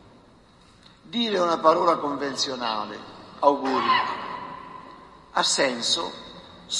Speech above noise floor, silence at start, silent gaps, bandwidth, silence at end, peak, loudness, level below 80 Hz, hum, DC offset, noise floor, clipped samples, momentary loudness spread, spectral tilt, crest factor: 30 dB; 1.05 s; none; 11.5 kHz; 0 s; -4 dBFS; -24 LUFS; -64 dBFS; none; under 0.1%; -54 dBFS; under 0.1%; 20 LU; -2 dB/octave; 22 dB